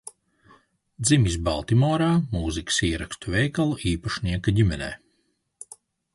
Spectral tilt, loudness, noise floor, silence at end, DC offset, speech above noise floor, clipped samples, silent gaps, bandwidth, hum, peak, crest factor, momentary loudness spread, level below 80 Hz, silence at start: -5 dB/octave; -24 LUFS; -71 dBFS; 1.2 s; under 0.1%; 48 dB; under 0.1%; none; 11.5 kHz; none; -6 dBFS; 18 dB; 22 LU; -38 dBFS; 0.05 s